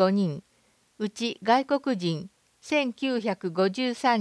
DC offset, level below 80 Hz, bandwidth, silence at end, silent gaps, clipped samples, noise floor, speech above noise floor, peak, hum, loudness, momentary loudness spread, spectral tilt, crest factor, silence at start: under 0.1%; -74 dBFS; 11 kHz; 0 s; none; under 0.1%; -65 dBFS; 40 dB; -8 dBFS; none; -27 LUFS; 11 LU; -5.5 dB/octave; 18 dB; 0 s